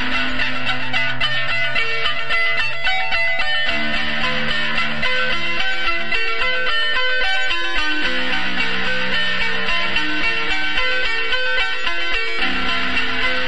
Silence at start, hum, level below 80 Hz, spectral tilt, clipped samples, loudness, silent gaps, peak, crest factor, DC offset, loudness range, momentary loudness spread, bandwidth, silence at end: 0 s; none; -38 dBFS; -3 dB/octave; under 0.1%; -19 LUFS; none; -4 dBFS; 14 dB; 10%; 0 LU; 2 LU; 11 kHz; 0 s